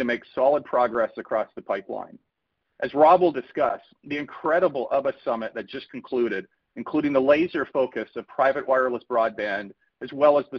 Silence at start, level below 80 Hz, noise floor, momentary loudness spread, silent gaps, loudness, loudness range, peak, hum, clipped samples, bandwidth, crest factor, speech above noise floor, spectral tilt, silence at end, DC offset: 0 s; -66 dBFS; -78 dBFS; 16 LU; none; -24 LUFS; 3 LU; -6 dBFS; none; under 0.1%; 6.2 kHz; 18 dB; 54 dB; -7.5 dB/octave; 0 s; under 0.1%